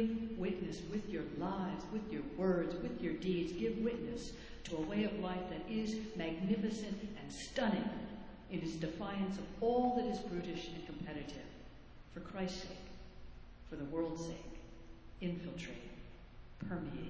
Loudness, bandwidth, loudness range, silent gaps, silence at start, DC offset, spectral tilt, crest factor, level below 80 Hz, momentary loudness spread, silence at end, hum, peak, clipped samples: -41 LUFS; 8 kHz; 7 LU; none; 0 s; under 0.1%; -6.5 dB/octave; 18 dB; -56 dBFS; 18 LU; 0 s; none; -22 dBFS; under 0.1%